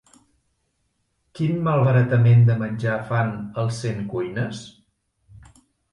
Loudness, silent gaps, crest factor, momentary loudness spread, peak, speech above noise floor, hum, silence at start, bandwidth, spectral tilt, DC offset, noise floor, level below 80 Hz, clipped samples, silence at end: -21 LUFS; none; 16 dB; 12 LU; -6 dBFS; 51 dB; none; 1.35 s; 10.5 kHz; -8 dB/octave; under 0.1%; -71 dBFS; -54 dBFS; under 0.1%; 1.25 s